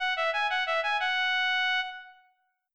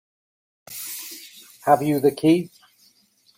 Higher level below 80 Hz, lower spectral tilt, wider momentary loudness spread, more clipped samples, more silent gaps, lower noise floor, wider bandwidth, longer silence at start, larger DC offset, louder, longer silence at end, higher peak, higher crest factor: about the same, -72 dBFS vs -68 dBFS; second, 3.5 dB/octave vs -5.5 dB/octave; second, 6 LU vs 21 LU; neither; neither; first, -70 dBFS vs -60 dBFS; second, 11 kHz vs 17 kHz; second, 0 s vs 0.7 s; first, 0.2% vs under 0.1%; second, -27 LUFS vs -21 LUFS; second, 0.6 s vs 0.9 s; second, -20 dBFS vs -4 dBFS; second, 10 dB vs 20 dB